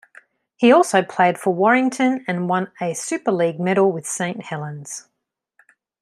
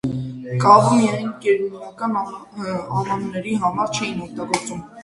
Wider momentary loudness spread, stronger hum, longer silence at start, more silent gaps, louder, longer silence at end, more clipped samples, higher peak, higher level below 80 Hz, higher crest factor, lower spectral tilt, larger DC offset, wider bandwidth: about the same, 14 LU vs 16 LU; neither; first, 0.6 s vs 0.05 s; neither; about the same, -19 LUFS vs -20 LUFS; first, 1 s vs 0 s; neither; about the same, -2 dBFS vs 0 dBFS; second, -70 dBFS vs -56 dBFS; about the same, 18 dB vs 20 dB; about the same, -5 dB/octave vs -5.5 dB/octave; neither; first, 13 kHz vs 11.5 kHz